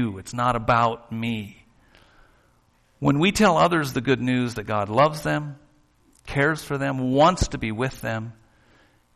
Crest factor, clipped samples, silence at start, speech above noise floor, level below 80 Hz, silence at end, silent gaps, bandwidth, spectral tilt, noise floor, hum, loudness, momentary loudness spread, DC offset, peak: 18 dB; under 0.1%; 0 s; 39 dB; -44 dBFS; 0.85 s; none; 13.5 kHz; -5.5 dB/octave; -62 dBFS; none; -23 LUFS; 12 LU; under 0.1%; -6 dBFS